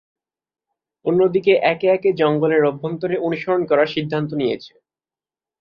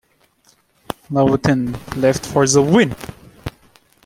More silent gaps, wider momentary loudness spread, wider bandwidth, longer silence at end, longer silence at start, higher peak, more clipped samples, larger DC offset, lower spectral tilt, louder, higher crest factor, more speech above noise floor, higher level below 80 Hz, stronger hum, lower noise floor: neither; second, 7 LU vs 20 LU; second, 6 kHz vs 16 kHz; first, 0.95 s vs 0.55 s; first, 1.05 s vs 0.9 s; about the same, -2 dBFS vs -2 dBFS; neither; neither; first, -8.5 dB/octave vs -5 dB/octave; second, -19 LUFS vs -16 LUFS; about the same, 18 dB vs 16 dB; first, over 72 dB vs 42 dB; second, -62 dBFS vs -46 dBFS; neither; first, under -90 dBFS vs -57 dBFS